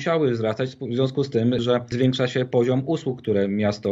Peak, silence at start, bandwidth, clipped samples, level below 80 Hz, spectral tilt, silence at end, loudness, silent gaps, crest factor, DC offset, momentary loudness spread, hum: -8 dBFS; 0 s; 7.8 kHz; under 0.1%; -58 dBFS; -7 dB/octave; 0 s; -23 LUFS; none; 14 dB; under 0.1%; 5 LU; none